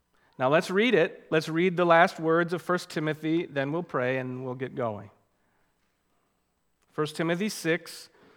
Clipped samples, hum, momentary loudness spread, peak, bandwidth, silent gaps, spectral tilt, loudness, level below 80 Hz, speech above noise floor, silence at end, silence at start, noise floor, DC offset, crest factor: under 0.1%; none; 13 LU; -4 dBFS; 18 kHz; none; -5.5 dB/octave; -27 LUFS; -78 dBFS; 47 dB; 0.3 s; 0.4 s; -74 dBFS; under 0.1%; 24 dB